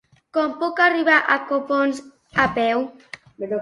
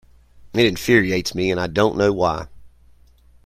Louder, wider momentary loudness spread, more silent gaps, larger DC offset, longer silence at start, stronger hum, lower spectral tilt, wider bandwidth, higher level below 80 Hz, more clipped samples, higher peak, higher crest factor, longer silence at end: about the same, -20 LUFS vs -19 LUFS; first, 17 LU vs 9 LU; neither; neither; about the same, 0.35 s vs 0.45 s; neither; about the same, -5 dB/octave vs -5 dB/octave; second, 11.5 kHz vs 16 kHz; second, -56 dBFS vs -44 dBFS; neither; about the same, -2 dBFS vs -2 dBFS; about the same, 18 dB vs 18 dB; second, 0 s vs 0.75 s